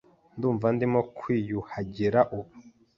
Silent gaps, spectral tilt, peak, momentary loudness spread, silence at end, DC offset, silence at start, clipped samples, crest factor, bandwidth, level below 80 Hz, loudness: none; -9.5 dB/octave; -6 dBFS; 13 LU; 0.3 s; under 0.1%; 0.35 s; under 0.1%; 22 dB; 7 kHz; -58 dBFS; -27 LUFS